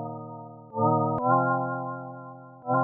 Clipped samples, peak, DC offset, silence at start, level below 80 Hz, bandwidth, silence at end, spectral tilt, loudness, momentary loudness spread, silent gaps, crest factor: under 0.1%; -10 dBFS; under 0.1%; 0 s; -70 dBFS; 2 kHz; 0 s; -5 dB/octave; -26 LUFS; 19 LU; none; 18 dB